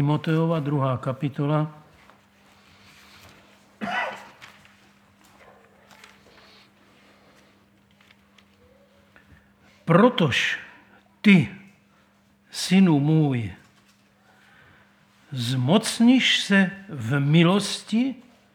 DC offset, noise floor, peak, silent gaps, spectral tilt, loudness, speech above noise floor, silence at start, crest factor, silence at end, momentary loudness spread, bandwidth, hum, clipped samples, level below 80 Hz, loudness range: under 0.1%; -60 dBFS; -4 dBFS; none; -5.5 dB/octave; -22 LUFS; 39 dB; 0 s; 22 dB; 0.35 s; 15 LU; 15 kHz; none; under 0.1%; -66 dBFS; 15 LU